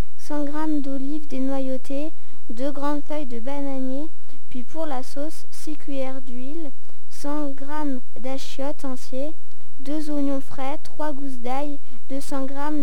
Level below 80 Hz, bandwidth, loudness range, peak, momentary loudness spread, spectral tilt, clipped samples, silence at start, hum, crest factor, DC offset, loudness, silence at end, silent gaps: -68 dBFS; 17 kHz; 4 LU; -8 dBFS; 10 LU; -6.5 dB/octave; under 0.1%; 0.2 s; none; 16 dB; 30%; -31 LUFS; 0 s; none